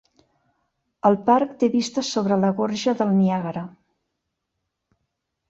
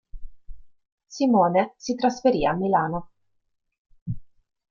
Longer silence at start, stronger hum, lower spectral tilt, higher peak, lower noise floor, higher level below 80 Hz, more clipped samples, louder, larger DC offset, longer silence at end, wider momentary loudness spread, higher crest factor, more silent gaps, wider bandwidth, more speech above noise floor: first, 1.05 s vs 0.15 s; neither; about the same, -6 dB/octave vs -6.5 dB/octave; about the same, -4 dBFS vs -6 dBFS; first, -79 dBFS vs -74 dBFS; second, -66 dBFS vs -46 dBFS; neither; about the same, -21 LUFS vs -23 LUFS; neither; first, 1.8 s vs 0.45 s; second, 8 LU vs 17 LU; about the same, 20 dB vs 18 dB; second, none vs 0.92-0.98 s, 3.78-3.85 s, 4.02-4.06 s; about the same, 8 kHz vs 7.4 kHz; first, 59 dB vs 52 dB